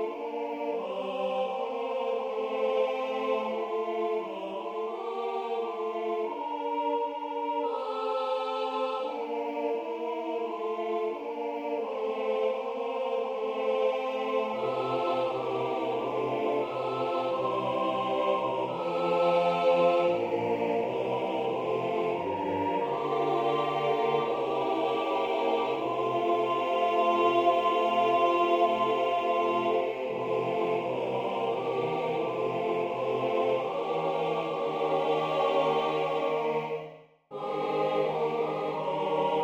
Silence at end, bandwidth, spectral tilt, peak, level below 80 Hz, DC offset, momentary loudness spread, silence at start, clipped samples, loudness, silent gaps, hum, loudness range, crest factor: 0 s; 15.5 kHz; -6 dB/octave; -12 dBFS; -74 dBFS; under 0.1%; 8 LU; 0 s; under 0.1%; -29 LUFS; none; none; 6 LU; 16 dB